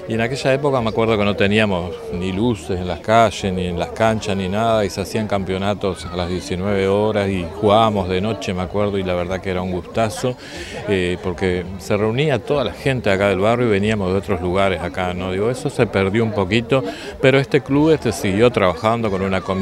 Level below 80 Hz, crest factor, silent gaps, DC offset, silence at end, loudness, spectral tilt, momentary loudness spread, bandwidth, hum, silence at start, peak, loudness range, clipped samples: -44 dBFS; 18 dB; none; under 0.1%; 0 s; -19 LUFS; -6 dB/octave; 8 LU; 13.5 kHz; none; 0 s; 0 dBFS; 4 LU; under 0.1%